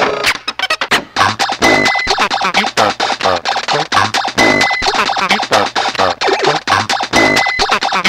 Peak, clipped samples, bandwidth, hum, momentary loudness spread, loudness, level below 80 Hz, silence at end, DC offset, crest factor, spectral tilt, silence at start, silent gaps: 0 dBFS; under 0.1%; 16.5 kHz; none; 5 LU; -12 LUFS; -40 dBFS; 0 s; under 0.1%; 14 dB; -2.5 dB/octave; 0 s; none